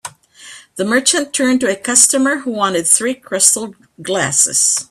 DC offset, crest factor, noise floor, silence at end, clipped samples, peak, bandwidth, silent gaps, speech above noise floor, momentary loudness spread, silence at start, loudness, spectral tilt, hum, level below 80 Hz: under 0.1%; 16 dB; -39 dBFS; 0.05 s; under 0.1%; 0 dBFS; over 20 kHz; none; 24 dB; 13 LU; 0.05 s; -13 LUFS; -1.5 dB/octave; none; -60 dBFS